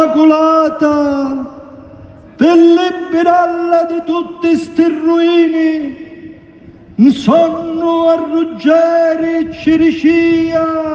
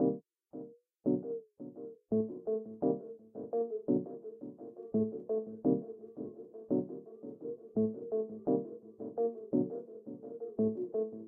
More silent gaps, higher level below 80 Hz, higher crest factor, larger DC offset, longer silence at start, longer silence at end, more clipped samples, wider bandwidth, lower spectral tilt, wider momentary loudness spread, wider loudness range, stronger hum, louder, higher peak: neither; first, -48 dBFS vs -78 dBFS; second, 12 dB vs 20 dB; neither; about the same, 0 s vs 0 s; about the same, 0 s vs 0 s; neither; first, 7.6 kHz vs 1.7 kHz; second, -6.5 dB/octave vs -11.5 dB/octave; second, 8 LU vs 14 LU; about the same, 2 LU vs 1 LU; neither; first, -11 LUFS vs -37 LUFS; first, 0 dBFS vs -18 dBFS